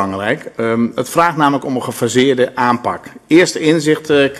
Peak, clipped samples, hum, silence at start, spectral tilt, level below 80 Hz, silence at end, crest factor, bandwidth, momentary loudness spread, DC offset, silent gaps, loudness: 0 dBFS; under 0.1%; none; 0 s; -5 dB/octave; -56 dBFS; 0 s; 14 dB; 14 kHz; 7 LU; under 0.1%; none; -14 LUFS